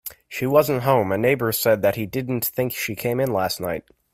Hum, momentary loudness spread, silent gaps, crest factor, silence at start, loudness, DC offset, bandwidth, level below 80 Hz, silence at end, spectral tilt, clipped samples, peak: none; 8 LU; none; 18 dB; 0.05 s; -22 LUFS; under 0.1%; 16 kHz; -56 dBFS; 0.35 s; -5 dB/octave; under 0.1%; -4 dBFS